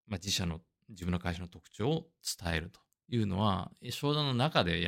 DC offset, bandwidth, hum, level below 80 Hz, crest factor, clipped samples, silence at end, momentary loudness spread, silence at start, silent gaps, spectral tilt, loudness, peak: under 0.1%; 16 kHz; none; -58 dBFS; 22 dB; under 0.1%; 0 s; 12 LU; 0.1 s; none; -5 dB/octave; -34 LUFS; -10 dBFS